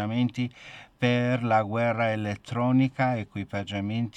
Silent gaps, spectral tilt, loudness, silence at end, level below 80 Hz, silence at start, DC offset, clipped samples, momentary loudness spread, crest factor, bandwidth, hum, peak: none; -7.5 dB/octave; -27 LUFS; 0 s; -64 dBFS; 0 s; under 0.1%; under 0.1%; 10 LU; 16 dB; 9.2 kHz; none; -10 dBFS